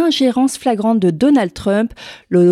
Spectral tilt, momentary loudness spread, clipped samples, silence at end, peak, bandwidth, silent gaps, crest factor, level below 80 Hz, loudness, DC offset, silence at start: -6 dB/octave; 5 LU; under 0.1%; 0 s; -2 dBFS; 13.5 kHz; none; 12 dB; -48 dBFS; -15 LUFS; under 0.1%; 0 s